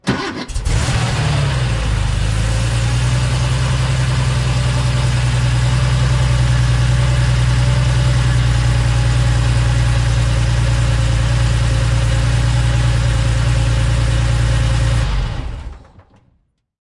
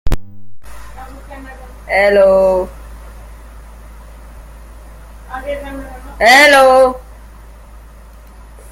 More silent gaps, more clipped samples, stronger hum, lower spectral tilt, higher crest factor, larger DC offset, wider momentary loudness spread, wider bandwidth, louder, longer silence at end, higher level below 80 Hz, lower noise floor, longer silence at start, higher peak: neither; neither; neither; first, -5.5 dB/octave vs -3.5 dB/octave; second, 10 dB vs 16 dB; neither; second, 3 LU vs 28 LU; second, 11.5 kHz vs 16.5 kHz; second, -16 LUFS vs -10 LUFS; second, 1.05 s vs 1.6 s; first, -20 dBFS vs -30 dBFS; first, -61 dBFS vs -37 dBFS; about the same, 0.05 s vs 0.05 s; second, -4 dBFS vs 0 dBFS